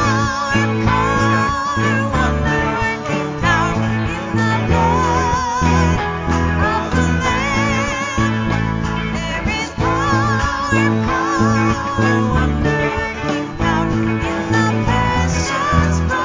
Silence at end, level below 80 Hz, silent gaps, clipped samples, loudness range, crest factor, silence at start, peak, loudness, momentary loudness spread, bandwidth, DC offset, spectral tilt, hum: 0 s; -26 dBFS; none; under 0.1%; 1 LU; 14 dB; 0 s; -2 dBFS; -17 LUFS; 5 LU; 7.6 kHz; under 0.1%; -5.5 dB/octave; none